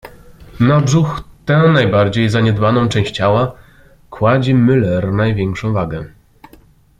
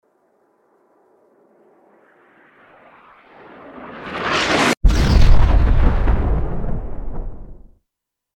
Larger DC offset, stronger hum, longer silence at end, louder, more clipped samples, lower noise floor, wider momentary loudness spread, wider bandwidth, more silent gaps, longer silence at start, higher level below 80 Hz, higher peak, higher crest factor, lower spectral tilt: neither; neither; about the same, 0.95 s vs 0.85 s; first, -14 LUFS vs -18 LUFS; neither; second, -46 dBFS vs -81 dBFS; second, 9 LU vs 22 LU; about the same, 10.5 kHz vs 11 kHz; neither; second, 0.05 s vs 3.75 s; second, -40 dBFS vs -20 dBFS; about the same, -2 dBFS vs 0 dBFS; about the same, 14 dB vs 18 dB; first, -7 dB/octave vs -5.5 dB/octave